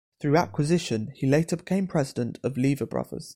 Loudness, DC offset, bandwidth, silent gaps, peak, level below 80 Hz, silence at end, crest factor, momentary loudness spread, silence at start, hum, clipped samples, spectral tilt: -26 LUFS; under 0.1%; 16 kHz; none; -8 dBFS; -54 dBFS; 0 s; 18 dB; 6 LU; 0.2 s; none; under 0.1%; -6.5 dB/octave